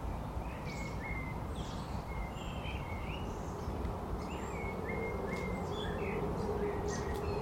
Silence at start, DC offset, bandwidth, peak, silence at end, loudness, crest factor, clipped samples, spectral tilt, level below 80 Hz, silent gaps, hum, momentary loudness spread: 0 s; under 0.1%; 16.5 kHz; -24 dBFS; 0 s; -39 LUFS; 14 dB; under 0.1%; -6 dB/octave; -44 dBFS; none; none; 5 LU